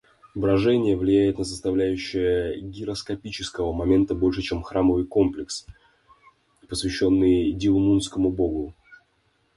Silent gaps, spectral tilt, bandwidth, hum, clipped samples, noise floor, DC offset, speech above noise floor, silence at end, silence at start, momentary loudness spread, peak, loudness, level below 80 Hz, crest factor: none; -6 dB/octave; 11.5 kHz; none; under 0.1%; -67 dBFS; under 0.1%; 44 dB; 0.6 s; 0.35 s; 12 LU; -8 dBFS; -23 LUFS; -42 dBFS; 16 dB